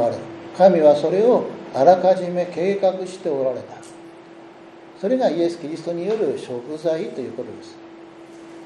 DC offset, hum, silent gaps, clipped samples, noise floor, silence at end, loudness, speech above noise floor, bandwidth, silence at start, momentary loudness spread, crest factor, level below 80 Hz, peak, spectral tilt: under 0.1%; none; none; under 0.1%; -43 dBFS; 0 s; -20 LUFS; 24 dB; 10.5 kHz; 0 s; 20 LU; 20 dB; -70 dBFS; -2 dBFS; -6.5 dB/octave